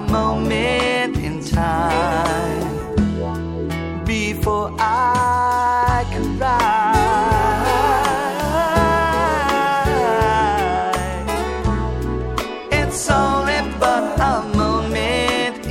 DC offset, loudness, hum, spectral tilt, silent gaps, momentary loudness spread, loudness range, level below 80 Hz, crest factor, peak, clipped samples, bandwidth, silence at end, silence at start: under 0.1%; -18 LUFS; none; -5 dB/octave; none; 7 LU; 4 LU; -30 dBFS; 16 dB; -2 dBFS; under 0.1%; 16.5 kHz; 0 s; 0 s